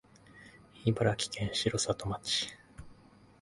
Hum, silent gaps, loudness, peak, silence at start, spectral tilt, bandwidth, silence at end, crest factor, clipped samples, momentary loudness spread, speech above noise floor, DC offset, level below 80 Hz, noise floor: none; none; -32 LUFS; -12 dBFS; 0.3 s; -4 dB/octave; 11.5 kHz; 0.5 s; 22 dB; under 0.1%; 20 LU; 26 dB; under 0.1%; -56 dBFS; -59 dBFS